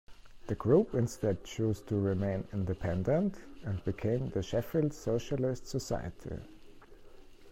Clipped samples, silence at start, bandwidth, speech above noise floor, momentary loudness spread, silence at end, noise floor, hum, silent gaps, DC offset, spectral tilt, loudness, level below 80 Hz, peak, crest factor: under 0.1%; 0.1 s; 16 kHz; 19 dB; 12 LU; 0 s; -52 dBFS; none; none; under 0.1%; -7.5 dB/octave; -33 LUFS; -52 dBFS; -14 dBFS; 18 dB